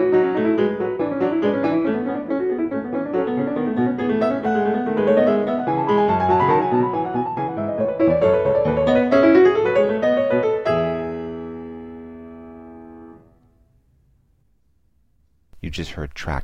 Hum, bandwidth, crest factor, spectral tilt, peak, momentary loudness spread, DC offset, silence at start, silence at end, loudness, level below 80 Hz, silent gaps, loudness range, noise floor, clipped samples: none; 7.8 kHz; 18 dB; -8 dB/octave; -2 dBFS; 17 LU; under 0.1%; 0 s; 0 s; -19 LUFS; -46 dBFS; none; 17 LU; -64 dBFS; under 0.1%